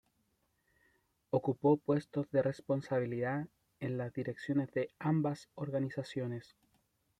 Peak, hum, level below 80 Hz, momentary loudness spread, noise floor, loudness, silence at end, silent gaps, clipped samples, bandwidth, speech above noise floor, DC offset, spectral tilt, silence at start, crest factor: -16 dBFS; none; -74 dBFS; 9 LU; -78 dBFS; -36 LUFS; 0.8 s; none; under 0.1%; 10.5 kHz; 43 dB; under 0.1%; -8.5 dB/octave; 1.35 s; 20 dB